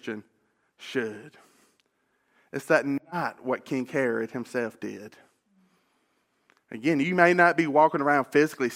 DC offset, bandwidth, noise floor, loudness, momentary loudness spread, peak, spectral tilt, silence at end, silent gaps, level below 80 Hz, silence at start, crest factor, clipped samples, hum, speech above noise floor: under 0.1%; 16.5 kHz; -72 dBFS; -25 LUFS; 18 LU; -4 dBFS; -6 dB/octave; 0 s; none; -78 dBFS; 0.05 s; 24 dB; under 0.1%; none; 47 dB